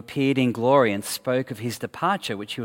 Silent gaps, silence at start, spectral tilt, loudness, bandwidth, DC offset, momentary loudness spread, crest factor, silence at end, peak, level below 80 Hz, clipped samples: none; 0.1 s; -5 dB/octave; -23 LUFS; 17 kHz; under 0.1%; 11 LU; 18 dB; 0 s; -6 dBFS; -66 dBFS; under 0.1%